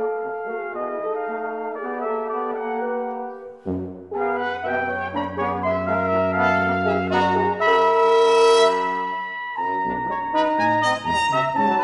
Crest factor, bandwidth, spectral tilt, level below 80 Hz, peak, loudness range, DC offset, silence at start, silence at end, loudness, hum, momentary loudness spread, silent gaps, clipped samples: 16 dB; 11.5 kHz; -5 dB/octave; -58 dBFS; -6 dBFS; 9 LU; under 0.1%; 0 s; 0 s; -21 LUFS; none; 12 LU; none; under 0.1%